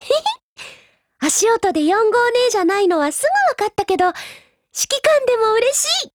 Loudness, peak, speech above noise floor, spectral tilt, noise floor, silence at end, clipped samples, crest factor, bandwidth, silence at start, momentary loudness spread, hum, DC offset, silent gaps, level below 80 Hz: -16 LUFS; -4 dBFS; 33 dB; -1 dB/octave; -49 dBFS; 0.05 s; under 0.1%; 14 dB; over 20 kHz; 0 s; 15 LU; none; under 0.1%; 0.43-0.56 s; -56 dBFS